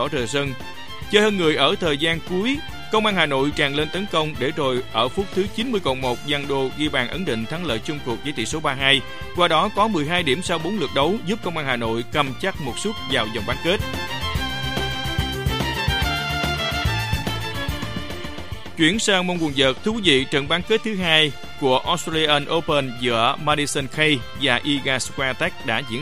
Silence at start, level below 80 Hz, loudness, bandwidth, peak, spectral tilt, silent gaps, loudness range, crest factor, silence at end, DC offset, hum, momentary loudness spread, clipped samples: 0 s; -38 dBFS; -21 LUFS; 15.5 kHz; -2 dBFS; -4 dB/octave; none; 4 LU; 20 dB; 0 s; 2%; none; 8 LU; under 0.1%